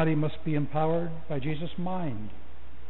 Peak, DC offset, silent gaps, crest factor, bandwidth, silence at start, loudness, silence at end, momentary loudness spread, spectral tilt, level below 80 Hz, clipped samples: -16 dBFS; 4%; none; 16 dB; 4.2 kHz; 0 s; -31 LUFS; 0 s; 16 LU; -7 dB/octave; -50 dBFS; under 0.1%